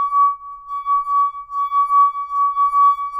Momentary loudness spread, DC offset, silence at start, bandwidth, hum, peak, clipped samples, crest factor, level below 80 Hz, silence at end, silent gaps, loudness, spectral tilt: 11 LU; under 0.1%; 0 s; 4.8 kHz; none; -6 dBFS; under 0.1%; 10 dB; -58 dBFS; 0 s; none; -17 LUFS; -0.5 dB/octave